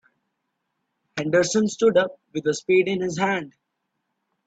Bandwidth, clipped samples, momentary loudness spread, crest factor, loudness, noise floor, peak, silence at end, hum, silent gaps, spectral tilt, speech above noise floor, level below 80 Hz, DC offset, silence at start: 9 kHz; under 0.1%; 10 LU; 18 dB; -22 LUFS; -78 dBFS; -6 dBFS; 1 s; none; none; -4.5 dB/octave; 56 dB; -66 dBFS; under 0.1%; 1.15 s